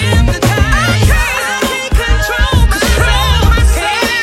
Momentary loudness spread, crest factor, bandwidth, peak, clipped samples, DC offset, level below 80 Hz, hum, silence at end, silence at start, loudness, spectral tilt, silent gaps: 3 LU; 10 dB; 16.5 kHz; 0 dBFS; under 0.1%; under 0.1%; -14 dBFS; none; 0 s; 0 s; -11 LUFS; -4.5 dB/octave; none